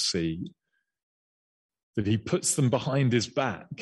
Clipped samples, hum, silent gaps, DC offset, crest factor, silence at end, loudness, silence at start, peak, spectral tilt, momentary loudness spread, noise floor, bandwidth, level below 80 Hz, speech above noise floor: under 0.1%; none; 1.03-1.69 s, 1.83-1.93 s; under 0.1%; 16 dB; 0 s; -27 LUFS; 0 s; -12 dBFS; -4.5 dB/octave; 11 LU; under -90 dBFS; 12 kHz; -60 dBFS; over 63 dB